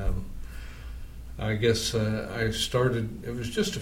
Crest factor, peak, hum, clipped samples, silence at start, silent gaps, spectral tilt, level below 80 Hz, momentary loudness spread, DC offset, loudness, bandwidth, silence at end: 18 dB; -10 dBFS; none; under 0.1%; 0 s; none; -5 dB/octave; -38 dBFS; 18 LU; under 0.1%; -28 LUFS; 16.5 kHz; 0 s